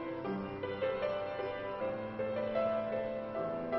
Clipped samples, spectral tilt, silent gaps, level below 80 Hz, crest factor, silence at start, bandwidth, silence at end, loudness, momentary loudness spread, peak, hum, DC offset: under 0.1%; -5 dB/octave; none; -64 dBFS; 14 dB; 0 s; 5.8 kHz; 0 s; -37 LUFS; 5 LU; -22 dBFS; none; under 0.1%